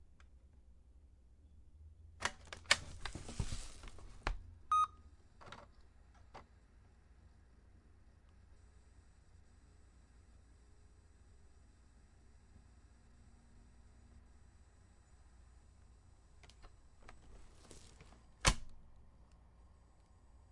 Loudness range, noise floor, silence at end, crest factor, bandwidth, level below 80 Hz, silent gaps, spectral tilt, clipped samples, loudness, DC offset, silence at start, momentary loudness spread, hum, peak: 26 LU; -65 dBFS; 0.05 s; 36 dB; 11.5 kHz; -54 dBFS; none; -2 dB/octave; under 0.1%; -39 LUFS; under 0.1%; 0 s; 31 LU; none; -10 dBFS